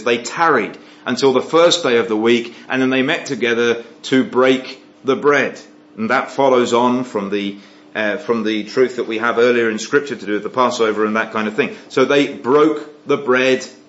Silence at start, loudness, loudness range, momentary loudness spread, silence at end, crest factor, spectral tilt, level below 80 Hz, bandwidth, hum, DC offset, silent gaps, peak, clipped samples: 0 s; -17 LUFS; 2 LU; 9 LU; 0.15 s; 16 dB; -4 dB/octave; -72 dBFS; 8 kHz; none; under 0.1%; none; 0 dBFS; under 0.1%